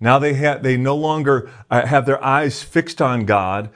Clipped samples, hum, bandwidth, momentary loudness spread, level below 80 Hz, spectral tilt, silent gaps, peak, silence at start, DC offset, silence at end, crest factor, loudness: under 0.1%; none; 10.5 kHz; 5 LU; -54 dBFS; -6.5 dB/octave; none; 0 dBFS; 0 s; under 0.1%; 0.05 s; 16 dB; -18 LUFS